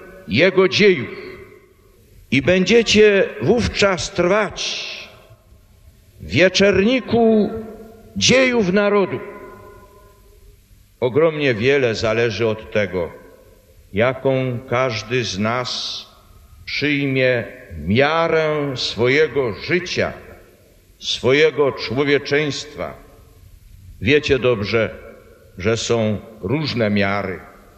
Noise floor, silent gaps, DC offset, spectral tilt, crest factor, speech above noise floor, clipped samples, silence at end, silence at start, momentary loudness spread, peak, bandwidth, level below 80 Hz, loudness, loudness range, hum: -50 dBFS; none; under 0.1%; -4.5 dB/octave; 18 dB; 33 dB; under 0.1%; 0.3 s; 0 s; 15 LU; -2 dBFS; 13 kHz; -44 dBFS; -18 LUFS; 5 LU; none